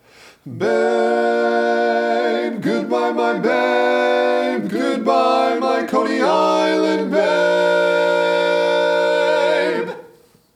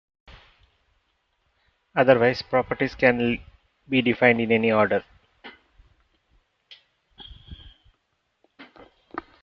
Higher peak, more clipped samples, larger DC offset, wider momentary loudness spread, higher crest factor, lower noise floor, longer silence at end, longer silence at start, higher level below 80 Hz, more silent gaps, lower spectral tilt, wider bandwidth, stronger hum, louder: about the same, -4 dBFS vs -2 dBFS; neither; neither; second, 5 LU vs 21 LU; second, 14 dB vs 24 dB; second, -49 dBFS vs -73 dBFS; first, 0.5 s vs 0.2 s; second, 0.45 s vs 1.95 s; second, -76 dBFS vs -54 dBFS; neither; second, -5 dB/octave vs -7.5 dB/octave; first, 14.5 kHz vs 6.4 kHz; neither; first, -17 LUFS vs -21 LUFS